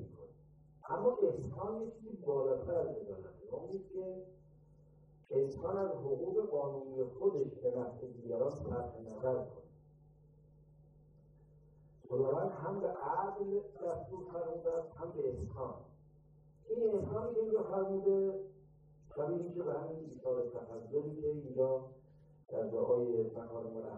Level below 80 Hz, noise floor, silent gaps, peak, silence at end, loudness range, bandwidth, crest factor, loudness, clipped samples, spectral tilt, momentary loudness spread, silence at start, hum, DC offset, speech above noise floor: -66 dBFS; -64 dBFS; none; -20 dBFS; 0 s; 5 LU; 7.4 kHz; 18 dB; -38 LUFS; under 0.1%; -10 dB/octave; 12 LU; 0 s; none; under 0.1%; 26 dB